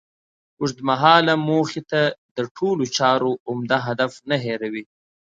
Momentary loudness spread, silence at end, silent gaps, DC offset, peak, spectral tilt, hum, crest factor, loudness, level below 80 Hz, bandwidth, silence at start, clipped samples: 13 LU; 0.55 s; 2.18-2.36 s, 2.51-2.55 s, 3.40-3.46 s; under 0.1%; 0 dBFS; -5 dB/octave; none; 22 dB; -21 LUFS; -66 dBFS; 9 kHz; 0.6 s; under 0.1%